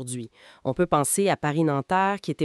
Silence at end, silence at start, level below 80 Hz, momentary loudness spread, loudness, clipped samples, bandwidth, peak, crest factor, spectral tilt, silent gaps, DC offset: 0 s; 0 s; -56 dBFS; 13 LU; -24 LUFS; under 0.1%; 13.5 kHz; -8 dBFS; 16 dB; -5 dB/octave; none; under 0.1%